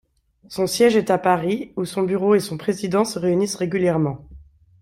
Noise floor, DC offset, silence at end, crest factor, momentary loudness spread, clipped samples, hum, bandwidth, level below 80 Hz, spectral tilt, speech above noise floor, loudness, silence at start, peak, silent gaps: -46 dBFS; under 0.1%; 0.4 s; 18 dB; 9 LU; under 0.1%; none; 16 kHz; -54 dBFS; -5.5 dB/octave; 26 dB; -20 LUFS; 0.5 s; -4 dBFS; none